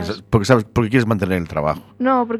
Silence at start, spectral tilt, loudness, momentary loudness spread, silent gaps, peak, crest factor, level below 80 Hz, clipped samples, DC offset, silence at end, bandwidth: 0 s; -7 dB/octave; -18 LUFS; 6 LU; none; 0 dBFS; 18 dB; -42 dBFS; under 0.1%; under 0.1%; 0 s; 14 kHz